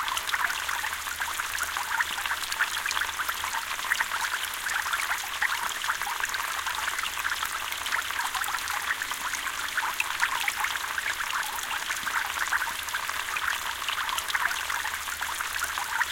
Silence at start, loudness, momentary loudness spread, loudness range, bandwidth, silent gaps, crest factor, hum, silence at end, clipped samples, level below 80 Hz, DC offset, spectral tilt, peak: 0 s; -28 LUFS; 3 LU; 1 LU; 17 kHz; none; 22 dB; none; 0 s; under 0.1%; -58 dBFS; under 0.1%; 1.5 dB/octave; -8 dBFS